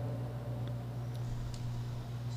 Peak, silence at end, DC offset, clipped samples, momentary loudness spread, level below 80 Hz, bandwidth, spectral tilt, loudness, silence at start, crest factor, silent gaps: -28 dBFS; 0 s; under 0.1%; under 0.1%; 1 LU; -50 dBFS; 15 kHz; -7.5 dB/octave; -40 LUFS; 0 s; 10 dB; none